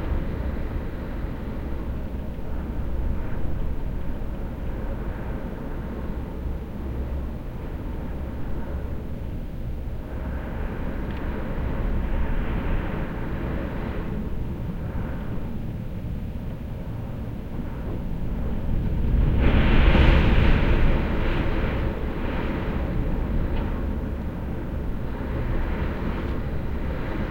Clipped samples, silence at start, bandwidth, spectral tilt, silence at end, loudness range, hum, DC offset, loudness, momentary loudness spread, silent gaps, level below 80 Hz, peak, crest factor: under 0.1%; 0 s; 16.5 kHz; -8.5 dB/octave; 0 s; 11 LU; none; under 0.1%; -28 LUFS; 11 LU; none; -26 dBFS; -4 dBFS; 20 dB